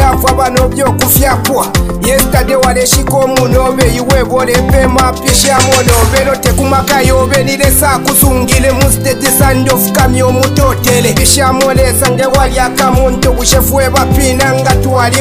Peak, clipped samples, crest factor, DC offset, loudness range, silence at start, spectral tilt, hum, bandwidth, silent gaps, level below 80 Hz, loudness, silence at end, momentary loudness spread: 0 dBFS; 0.8%; 8 dB; under 0.1%; 1 LU; 0 s; -4 dB/octave; none; over 20 kHz; none; -16 dBFS; -8 LUFS; 0 s; 3 LU